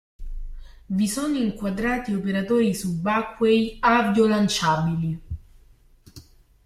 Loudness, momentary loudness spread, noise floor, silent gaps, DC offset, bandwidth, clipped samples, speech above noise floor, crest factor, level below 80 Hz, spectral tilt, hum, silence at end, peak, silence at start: -22 LUFS; 19 LU; -54 dBFS; none; under 0.1%; 15 kHz; under 0.1%; 32 dB; 18 dB; -42 dBFS; -5.5 dB/octave; none; 0.45 s; -6 dBFS; 0.2 s